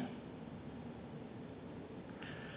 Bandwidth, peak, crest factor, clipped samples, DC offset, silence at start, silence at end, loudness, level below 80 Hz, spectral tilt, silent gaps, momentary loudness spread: 4 kHz; -32 dBFS; 16 dB; under 0.1%; under 0.1%; 0 s; 0 s; -50 LUFS; -66 dBFS; -5.5 dB/octave; none; 2 LU